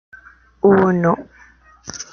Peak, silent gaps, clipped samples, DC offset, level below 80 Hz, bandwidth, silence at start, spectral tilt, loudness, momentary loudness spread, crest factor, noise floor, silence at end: -2 dBFS; none; under 0.1%; under 0.1%; -52 dBFS; 7 kHz; 0.65 s; -6.5 dB/octave; -16 LUFS; 20 LU; 16 dB; -48 dBFS; 0.1 s